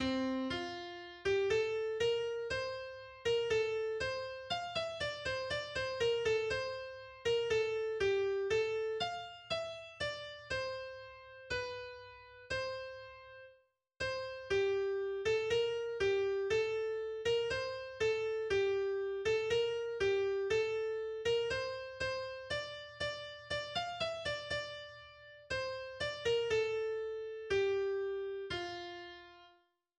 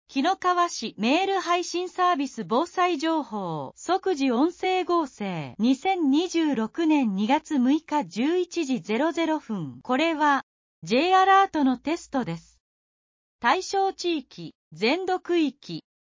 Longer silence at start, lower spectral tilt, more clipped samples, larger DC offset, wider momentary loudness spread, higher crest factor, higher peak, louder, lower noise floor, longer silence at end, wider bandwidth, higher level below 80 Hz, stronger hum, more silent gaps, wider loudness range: about the same, 0 s vs 0.1 s; about the same, -4 dB/octave vs -4.5 dB/octave; neither; neither; first, 12 LU vs 9 LU; about the same, 14 dB vs 16 dB; second, -22 dBFS vs -8 dBFS; second, -37 LUFS vs -25 LUFS; second, -70 dBFS vs under -90 dBFS; first, 0.5 s vs 0.2 s; first, 9.8 kHz vs 7.6 kHz; first, -62 dBFS vs -68 dBFS; neither; second, none vs 10.43-10.82 s, 12.60-13.39 s, 14.55-14.71 s; about the same, 6 LU vs 4 LU